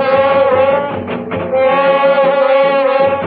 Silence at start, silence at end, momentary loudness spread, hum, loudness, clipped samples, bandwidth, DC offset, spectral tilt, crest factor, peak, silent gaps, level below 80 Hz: 0 s; 0 s; 9 LU; none; -12 LUFS; under 0.1%; 4.9 kHz; under 0.1%; -8.5 dB/octave; 10 dB; 0 dBFS; none; -54 dBFS